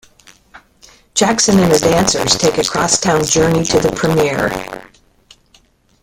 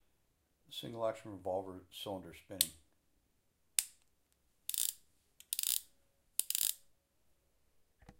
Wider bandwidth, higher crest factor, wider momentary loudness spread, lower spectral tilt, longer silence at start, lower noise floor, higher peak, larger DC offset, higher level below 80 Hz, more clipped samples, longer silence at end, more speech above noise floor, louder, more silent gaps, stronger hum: about the same, 17 kHz vs 17 kHz; second, 16 dB vs 36 dB; second, 9 LU vs 15 LU; first, -3.5 dB/octave vs -1 dB/octave; first, 1.15 s vs 0.7 s; second, -52 dBFS vs -78 dBFS; first, 0 dBFS vs -8 dBFS; neither; first, -40 dBFS vs -74 dBFS; neither; first, 1.15 s vs 0.05 s; about the same, 39 dB vs 36 dB; first, -13 LUFS vs -38 LUFS; neither; neither